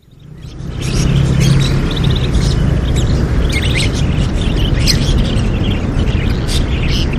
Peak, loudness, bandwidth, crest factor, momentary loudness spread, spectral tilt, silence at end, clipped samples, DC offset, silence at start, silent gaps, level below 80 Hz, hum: 0 dBFS; -14 LUFS; 14.5 kHz; 14 dB; 4 LU; -5.5 dB/octave; 0 s; under 0.1%; under 0.1%; 0.25 s; none; -18 dBFS; none